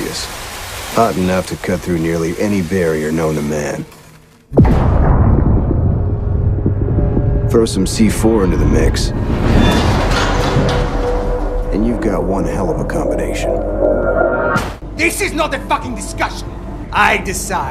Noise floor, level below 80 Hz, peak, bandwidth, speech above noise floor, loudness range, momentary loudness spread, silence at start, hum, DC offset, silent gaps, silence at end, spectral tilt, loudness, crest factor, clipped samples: -42 dBFS; -20 dBFS; 0 dBFS; 15.5 kHz; 28 dB; 3 LU; 8 LU; 0 s; none; under 0.1%; none; 0 s; -6 dB/octave; -16 LUFS; 14 dB; under 0.1%